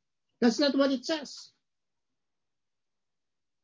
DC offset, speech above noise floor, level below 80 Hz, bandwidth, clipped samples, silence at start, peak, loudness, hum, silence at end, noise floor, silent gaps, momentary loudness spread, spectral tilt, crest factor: under 0.1%; over 63 dB; -78 dBFS; 7.8 kHz; under 0.1%; 0.4 s; -12 dBFS; -28 LUFS; none; 2.2 s; under -90 dBFS; none; 16 LU; -3.5 dB/octave; 20 dB